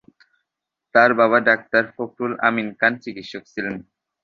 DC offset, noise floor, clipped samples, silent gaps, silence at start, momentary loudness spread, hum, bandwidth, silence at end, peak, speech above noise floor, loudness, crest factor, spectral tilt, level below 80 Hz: under 0.1%; -84 dBFS; under 0.1%; none; 0.95 s; 17 LU; none; 7 kHz; 0.45 s; 0 dBFS; 64 dB; -19 LUFS; 20 dB; -6.5 dB/octave; -64 dBFS